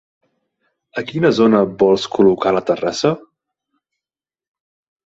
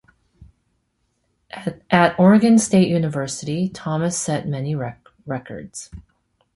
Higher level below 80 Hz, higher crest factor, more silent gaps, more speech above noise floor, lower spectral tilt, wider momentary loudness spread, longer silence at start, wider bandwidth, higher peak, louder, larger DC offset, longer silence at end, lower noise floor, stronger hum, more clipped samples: about the same, -56 dBFS vs -52 dBFS; about the same, 18 dB vs 18 dB; neither; first, over 75 dB vs 51 dB; about the same, -6 dB/octave vs -5.5 dB/octave; second, 12 LU vs 20 LU; first, 0.95 s vs 0.4 s; second, 8 kHz vs 11.5 kHz; about the same, 0 dBFS vs -2 dBFS; first, -16 LUFS vs -19 LUFS; neither; first, 1.9 s vs 0.55 s; first, under -90 dBFS vs -70 dBFS; neither; neither